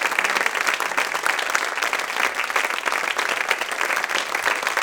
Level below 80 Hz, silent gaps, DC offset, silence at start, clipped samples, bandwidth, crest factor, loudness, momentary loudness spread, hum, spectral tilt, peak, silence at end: -64 dBFS; none; under 0.1%; 0 s; under 0.1%; 19.5 kHz; 22 dB; -21 LUFS; 2 LU; none; 0.5 dB/octave; 0 dBFS; 0 s